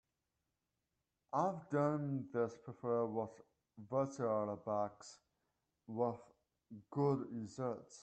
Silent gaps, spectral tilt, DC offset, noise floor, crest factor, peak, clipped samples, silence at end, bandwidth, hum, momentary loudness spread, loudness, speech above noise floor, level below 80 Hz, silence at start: none; -8 dB/octave; under 0.1%; -88 dBFS; 18 dB; -24 dBFS; under 0.1%; 0 s; 8.8 kHz; none; 14 LU; -40 LUFS; 49 dB; -82 dBFS; 1.35 s